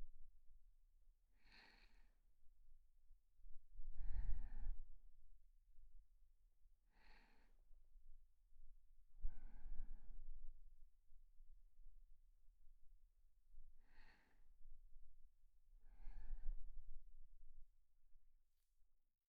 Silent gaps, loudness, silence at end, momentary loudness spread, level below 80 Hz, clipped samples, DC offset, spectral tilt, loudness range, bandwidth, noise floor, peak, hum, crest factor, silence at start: none; -60 LUFS; 0.35 s; 14 LU; -56 dBFS; under 0.1%; under 0.1%; -5.5 dB/octave; 7 LU; 4.6 kHz; -74 dBFS; -28 dBFS; none; 20 dB; 0 s